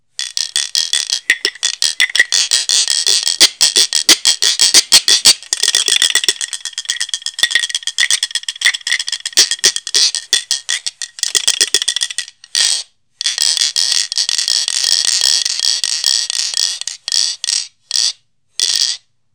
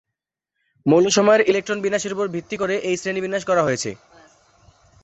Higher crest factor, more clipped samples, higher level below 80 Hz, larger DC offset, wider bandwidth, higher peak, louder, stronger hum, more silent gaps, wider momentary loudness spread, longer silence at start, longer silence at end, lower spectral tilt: about the same, 16 dB vs 18 dB; first, 0.6% vs under 0.1%; about the same, -64 dBFS vs -60 dBFS; first, 0.1% vs under 0.1%; first, 11 kHz vs 8.2 kHz; first, 0 dBFS vs -4 dBFS; first, -12 LUFS vs -20 LUFS; neither; neither; about the same, 10 LU vs 11 LU; second, 0.2 s vs 0.85 s; second, 0.4 s vs 1.1 s; second, 4 dB/octave vs -4 dB/octave